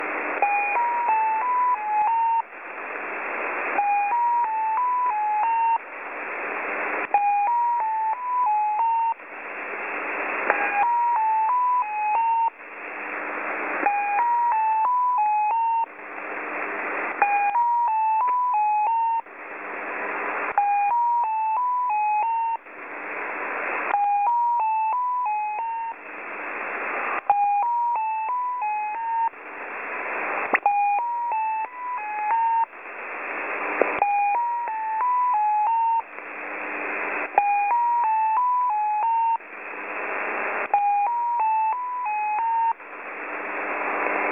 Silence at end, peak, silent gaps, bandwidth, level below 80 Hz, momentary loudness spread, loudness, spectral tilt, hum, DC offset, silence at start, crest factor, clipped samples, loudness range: 0 s; 0 dBFS; none; 3.7 kHz; -74 dBFS; 10 LU; -24 LUFS; -5 dB/octave; none; under 0.1%; 0 s; 24 dB; under 0.1%; 2 LU